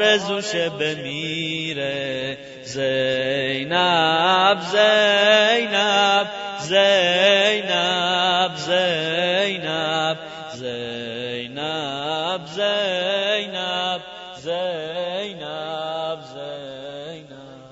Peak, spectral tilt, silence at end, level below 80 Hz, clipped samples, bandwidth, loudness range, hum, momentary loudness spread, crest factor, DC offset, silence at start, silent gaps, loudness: -4 dBFS; -3 dB/octave; 0.05 s; -64 dBFS; under 0.1%; 8 kHz; 9 LU; none; 15 LU; 18 dB; under 0.1%; 0 s; none; -20 LUFS